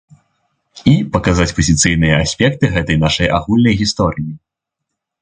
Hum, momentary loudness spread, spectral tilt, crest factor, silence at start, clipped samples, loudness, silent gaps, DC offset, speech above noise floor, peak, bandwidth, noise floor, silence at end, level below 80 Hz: none; 6 LU; -5 dB/octave; 16 dB; 0.75 s; under 0.1%; -14 LUFS; none; under 0.1%; 65 dB; 0 dBFS; 9.6 kHz; -78 dBFS; 0.85 s; -30 dBFS